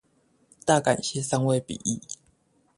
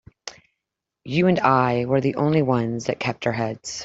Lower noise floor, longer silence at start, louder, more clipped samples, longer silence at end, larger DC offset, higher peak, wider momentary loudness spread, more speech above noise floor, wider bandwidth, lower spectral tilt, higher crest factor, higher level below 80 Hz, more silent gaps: second, -66 dBFS vs -84 dBFS; first, 0.65 s vs 0.25 s; second, -26 LUFS vs -21 LUFS; neither; first, 0.65 s vs 0 s; neither; about the same, -6 dBFS vs -4 dBFS; about the same, 13 LU vs 11 LU; second, 41 dB vs 63 dB; first, 11.5 kHz vs 8 kHz; second, -4.5 dB/octave vs -6 dB/octave; about the same, 22 dB vs 20 dB; about the same, -60 dBFS vs -58 dBFS; neither